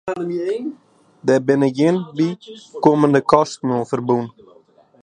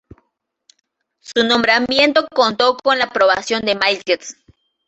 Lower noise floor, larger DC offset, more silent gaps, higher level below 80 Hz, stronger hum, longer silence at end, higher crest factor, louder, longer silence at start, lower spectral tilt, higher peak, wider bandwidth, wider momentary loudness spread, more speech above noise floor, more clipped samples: second, -51 dBFS vs -69 dBFS; neither; neither; about the same, -60 dBFS vs -56 dBFS; neither; first, 0.75 s vs 0.55 s; about the same, 18 dB vs 18 dB; second, -18 LUFS vs -15 LUFS; second, 0.05 s vs 1.3 s; first, -7 dB/octave vs -2.5 dB/octave; about the same, 0 dBFS vs 0 dBFS; first, 10 kHz vs 8.2 kHz; first, 12 LU vs 7 LU; second, 33 dB vs 53 dB; neither